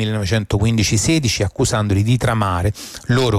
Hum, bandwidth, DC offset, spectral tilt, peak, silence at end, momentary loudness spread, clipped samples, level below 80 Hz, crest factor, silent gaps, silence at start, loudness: none; 15.5 kHz; under 0.1%; -5 dB/octave; -6 dBFS; 0 s; 4 LU; under 0.1%; -34 dBFS; 12 dB; none; 0 s; -17 LUFS